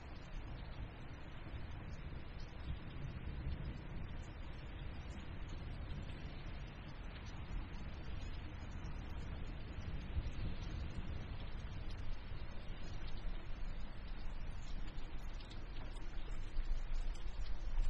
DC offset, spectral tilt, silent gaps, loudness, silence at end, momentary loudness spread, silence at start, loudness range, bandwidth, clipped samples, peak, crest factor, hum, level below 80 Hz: under 0.1%; -6.5 dB/octave; none; -50 LUFS; 0 s; 5 LU; 0 s; 3 LU; 7.6 kHz; under 0.1%; -26 dBFS; 16 dB; none; -44 dBFS